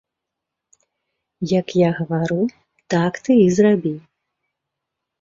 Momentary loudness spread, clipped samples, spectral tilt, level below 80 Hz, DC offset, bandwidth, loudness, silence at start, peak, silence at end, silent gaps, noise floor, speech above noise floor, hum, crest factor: 11 LU; under 0.1%; -7 dB/octave; -60 dBFS; under 0.1%; 7.8 kHz; -18 LUFS; 1.4 s; -4 dBFS; 1.25 s; none; -82 dBFS; 65 dB; none; 18 dB